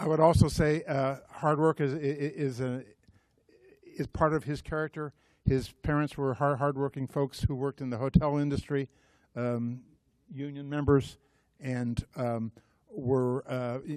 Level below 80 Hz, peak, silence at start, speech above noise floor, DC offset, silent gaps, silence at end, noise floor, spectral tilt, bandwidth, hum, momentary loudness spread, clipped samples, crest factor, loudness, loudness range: -48 dBFS; -8 dBFS; 0 s; 35 dB; under 0.1%; none; 0 s; -65 dBFS; -7.5 dB/octave; 13.5 kHz; none; 14 LU; under 0.1%; 22 dB; -30 LUFS; 4 LU